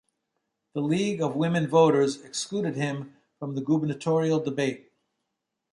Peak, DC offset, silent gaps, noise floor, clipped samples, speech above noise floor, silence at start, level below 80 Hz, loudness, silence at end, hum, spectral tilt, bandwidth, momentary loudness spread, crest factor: -8 dBFS; under 0.1%; none; -83 dBFS; under 0.1%; 57 dB; 0.75 s; -70 dBFS; -26 LUFS; 0.95 s; none; -6 dB/octave; 11.5 kHz; 16 LU; 20 dB